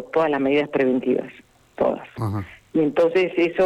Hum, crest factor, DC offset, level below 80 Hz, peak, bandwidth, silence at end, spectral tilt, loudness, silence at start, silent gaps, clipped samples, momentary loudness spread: none; 10 dB; under 0.1%; -58 dBFS; -10 dBFS; 12.5 kHz; 0 s; -7.5 dB/octave; -22 LUFS; 0 s; none; under 0.1%; 9 LU